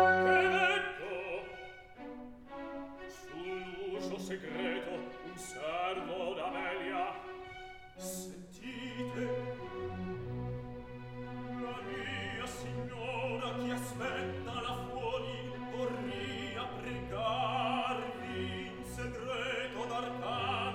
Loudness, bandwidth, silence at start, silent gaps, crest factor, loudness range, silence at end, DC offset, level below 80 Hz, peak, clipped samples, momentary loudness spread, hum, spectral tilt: -37 LUFS; 16.5 kHz; 0 s; none; 24 dB; 5 LU; 0 s; under 0.1%; -60 dBFS; -14 dBFS; under 0.1%; 13 LU; none; -4.5 dB/octave